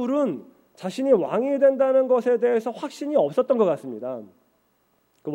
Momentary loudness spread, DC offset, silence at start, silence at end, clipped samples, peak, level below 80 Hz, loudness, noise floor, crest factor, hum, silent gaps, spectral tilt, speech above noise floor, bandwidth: 15 LU; under 0.1%; 0 s; 0 s; under 0.1%; -8 dBFS; -74 dBFS; -22 LUFS; -67 dBFS; 16 dB; none; none; -6.5 dB/octave; 45 dB; 11 kHz